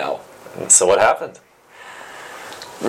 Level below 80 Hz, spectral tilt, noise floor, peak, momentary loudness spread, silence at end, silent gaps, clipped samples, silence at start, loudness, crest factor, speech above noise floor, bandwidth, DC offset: -58 dBFS; -1 dB/octave; -41 dBFS; 0 dBFS; 24 LU; 0 s; none; under 0.1%; 0 s; -14 LUFS; 20 dB; 25 dB; 16.5 kHz; under 0.1%